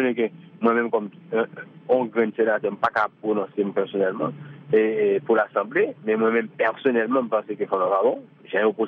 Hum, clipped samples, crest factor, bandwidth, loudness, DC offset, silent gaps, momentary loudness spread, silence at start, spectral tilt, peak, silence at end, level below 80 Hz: none; under 0.1%; 16 dB; 4.9 kHz; -23 LUFS; under 0.1%; none; 7 LU; 0 s; -8.5 dB/octave; -8 dBFS; 0 s; -76 dBFS